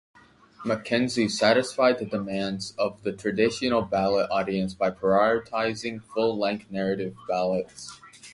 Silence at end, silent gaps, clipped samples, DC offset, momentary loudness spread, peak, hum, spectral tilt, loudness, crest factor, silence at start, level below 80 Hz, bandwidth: 0 s; none; under 0.1%; under 0.1%; 9 LU; -6 dBFS; none; -5 dB/octave; -26 LUFS; 20 dB; 0.6 s; -58 dBFS; 11.5 kHz